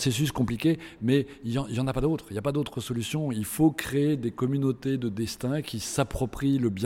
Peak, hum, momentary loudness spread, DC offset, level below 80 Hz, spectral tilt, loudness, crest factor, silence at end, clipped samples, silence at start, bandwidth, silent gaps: -10 dBFS; none; 6 LU; under 0.1%; -48 dBFS; -6 dB/octave; -28 LUFS; 16 dB; 0 s; under 0.1%; 0 s; 17 kHz; none